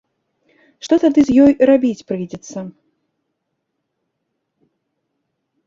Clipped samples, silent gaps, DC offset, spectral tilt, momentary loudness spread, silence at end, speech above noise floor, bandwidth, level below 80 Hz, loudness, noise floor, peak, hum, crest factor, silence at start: under 0.1%; none; under 0.1%; -6.5 dB/octave; 20 LU; 2.95 s; 60 dB; 7.6 kHz; -52 dBFS; -14 LUFS; -74 dBFS; -2 dBFS; none; 18 dB; 0.85 s